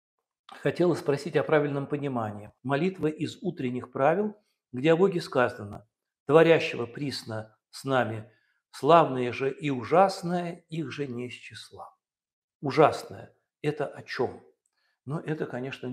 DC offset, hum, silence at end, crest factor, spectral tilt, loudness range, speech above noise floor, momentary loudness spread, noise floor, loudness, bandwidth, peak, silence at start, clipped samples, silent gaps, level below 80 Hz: under 0.1%; none; 0 s; 24 dB; -6.5 dB/octave; 5 LU; 49 dB; 18 LU; -75 dBFS; -27 LUFS; 14 kHz; -4 dBFS; 0.5 s; under 0.1%; 6.20-6.26 s, 12.33-12.48 s, 12.55-12.60 s; -70 dBFS